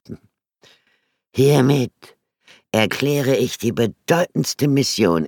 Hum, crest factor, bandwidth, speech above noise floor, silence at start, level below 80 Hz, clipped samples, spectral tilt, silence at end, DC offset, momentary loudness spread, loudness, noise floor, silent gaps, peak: none; 18 dB; 19 kHz; 49 dB; 0.1 s; -58 dBFS; under 0.1%; -5.5 dB/octave; 0 s; under 0.1%; 10 LU; -19 LUFS; -66 dBFS; none; -2 dBFS